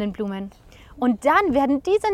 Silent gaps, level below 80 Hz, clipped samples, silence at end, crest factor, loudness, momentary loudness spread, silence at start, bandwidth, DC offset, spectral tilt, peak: none; -48 dBFS; under 0.1%; 0 s; 16 dB; -21 LUFS; 13 LU; 0 s; 14 kHz; under 0.1%; -6 dB/octave; -4 dBFS